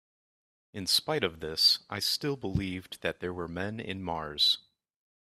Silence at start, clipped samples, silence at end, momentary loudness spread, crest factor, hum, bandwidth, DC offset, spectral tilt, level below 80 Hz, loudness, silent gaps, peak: 0.75 s; under 0.1%; 0.7 s; 13 LU; 20 dB; none; 15.5 kHz; under 0.1%; -3 dB/octave; -56 dBFS; -29 LUFS; none; -12 dBFS